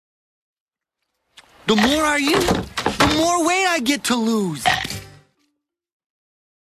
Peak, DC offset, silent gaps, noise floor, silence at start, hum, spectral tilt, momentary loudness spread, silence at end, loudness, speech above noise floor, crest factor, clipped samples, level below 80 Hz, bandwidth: -4 dBFS; under 0.1%; none; -79 dBFS; 1.65 s; none; -3.5 dB/octave; 7 LU; 1.5 s; -18 LUFS; 61 dB; 18 dB; under 0.1%; -42 dBFS; 14 kHz